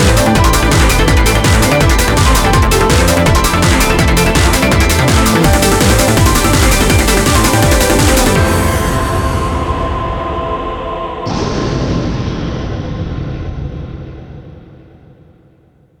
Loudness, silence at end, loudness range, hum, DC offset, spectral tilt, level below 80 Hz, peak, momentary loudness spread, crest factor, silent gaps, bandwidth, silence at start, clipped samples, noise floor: -11 LUFS; 1.35 s; 11 LU; none; under 0.1%; -4.5 dB/octave; -18 dBFS; 0 dBFS; 11 LU; 12 dB; none; 19.5 kHz; 0 s; under 0.1%; -48 dBFS